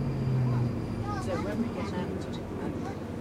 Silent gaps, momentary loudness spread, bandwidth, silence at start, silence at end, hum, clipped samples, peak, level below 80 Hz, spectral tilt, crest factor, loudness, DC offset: none; 8 LU; 12 kHz; 0 s; 0 s; none; under 0.1%; -18 dBFS; -48 dBFS; -8 dB/octave; 12 dB; -32 LUFS; under 0.1%